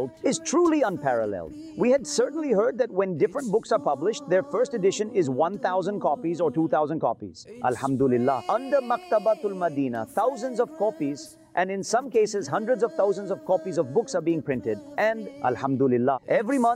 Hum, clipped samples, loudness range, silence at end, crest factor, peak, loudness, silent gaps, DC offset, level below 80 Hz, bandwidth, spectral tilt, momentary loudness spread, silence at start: none; under 0.1%; 2 LU; 0 s; 14 dB; -12 dBFS; -25 LUFS; none; under 0.1%; -66 dBFS; 15 kHz; -5.5 dB/octave; 6 LU; 0 s